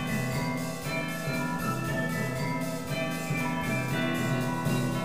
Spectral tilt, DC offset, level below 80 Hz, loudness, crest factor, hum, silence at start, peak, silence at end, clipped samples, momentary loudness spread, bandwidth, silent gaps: -5.5 dB/octave; 0.5%; -52 dBFS; -30 LUFS; 14 dB; none; 0 s; -16 dBFS; 0 s; under 0.1%; 3 LU; 15.5 kHz; none